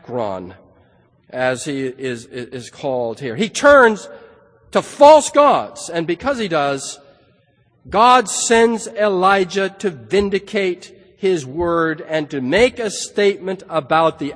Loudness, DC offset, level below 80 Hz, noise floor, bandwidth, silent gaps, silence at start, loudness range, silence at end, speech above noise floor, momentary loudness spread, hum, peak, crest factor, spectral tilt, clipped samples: -16 LUFS; under 0.1%; -50 dBFS; -58 dBFS; 10.5 kHz; none; 0.1 s; 5 LU; 0 s; 41 dB; 15 LU; none; 0 dBFS; 18 dB; -4 dB/octave; under 0.1%